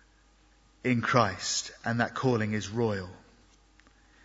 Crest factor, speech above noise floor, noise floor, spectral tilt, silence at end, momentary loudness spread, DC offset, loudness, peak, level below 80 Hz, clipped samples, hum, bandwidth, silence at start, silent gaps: 26 dB; 33 dB; -62 dBFS; -4.5 dB/octave; 1.05 s; 8 LU; under 0.1%; -29 LUFS; -6 dBFS; -62 dBFS; under 0.1%; none; 8 kHz; 0.85 s; none